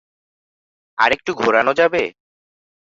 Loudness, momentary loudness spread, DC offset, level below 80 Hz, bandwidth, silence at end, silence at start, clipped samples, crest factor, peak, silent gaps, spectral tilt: -17 LUFS; 10 LU; under 0.1%; -58 dBFS; 7.8 kHz; 0.8 s; 1 s; under 0.1%; 20 dB; 0 dBFS; none; -4 dB/octave